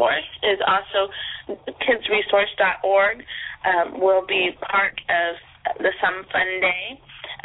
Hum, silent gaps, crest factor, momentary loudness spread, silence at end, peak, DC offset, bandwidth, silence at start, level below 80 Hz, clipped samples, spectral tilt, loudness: none; none; 16 dB; 12 LU; 0.1 s; -6 dBFS; under 0.1%; 4.1 kHz; 0 s; -58 dBFS; under 0.1%; -6.5 dB/octave; -21 LUFS